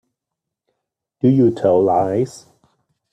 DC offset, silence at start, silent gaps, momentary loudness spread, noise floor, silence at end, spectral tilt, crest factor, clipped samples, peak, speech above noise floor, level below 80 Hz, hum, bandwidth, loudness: under 0.1%; 1.25 s; none; 7 LU; -83 dBFS; 0.75 s; -9 dB/octave; 16 dB; under 0.1%; -4 dBFS; 67 dB; -58 dBFS; none; 10 kHz; -17 LUFS